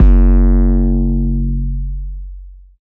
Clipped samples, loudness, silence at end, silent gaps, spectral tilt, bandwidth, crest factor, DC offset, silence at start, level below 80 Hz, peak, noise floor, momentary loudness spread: under 0.1%; -15 LUFS; 0.3 s; none; -12.5 dB/octave; 2.1 kHz; 12 dB; under 0.1%; 0 s; -12 dBFS; 0 dBFS; -33 dBFS; 18 LU